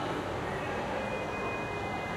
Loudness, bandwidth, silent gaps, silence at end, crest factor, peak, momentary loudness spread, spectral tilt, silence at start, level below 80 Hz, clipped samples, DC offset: -34 LUFS; 16 kHz; none; 0 s; 12 dB; -22 dBFS; 1 LU; -5.5 dB/octave; 0 s; -52 dBFS; under 0.1%; under 0.1%